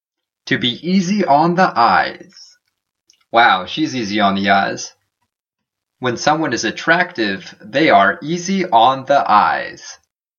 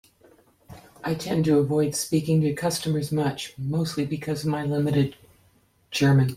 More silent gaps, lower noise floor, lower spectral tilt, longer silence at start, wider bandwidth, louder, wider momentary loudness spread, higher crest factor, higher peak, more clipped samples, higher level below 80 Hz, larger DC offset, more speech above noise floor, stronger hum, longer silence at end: neither; first, -81 dBFS vs -62 dBFS; second, -4.5 dB/octave vs -6 dB/octave; second, 0.45 s vs 0.7 s; second, 7.4 kHz vs 16 kHz; first, -15 LUFS vs -25 LUFS; first, 11 LU vs 8 LU; about the same, 16 dB vs 14 dB; first, 0 dBFS vs -10 dBFS; neither; about the same, -60 dBFS vs -56 dBFS; neither; first, 66 dB vs 38 dB; neither; first, 0.45 s vs 0 s